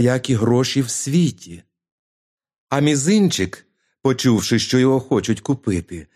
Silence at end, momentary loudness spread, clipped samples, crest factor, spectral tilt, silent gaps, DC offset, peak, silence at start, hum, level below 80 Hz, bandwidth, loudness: 0.1 s; 8 LU; under 0.1%; 16 dB; -5 dB/octave; 1.92-2.38 s, 2.58-2.67 s; under 0.1%; -2 dBFS; 0 s; none; -52 dBFS; 15 kHz; -19 LUFS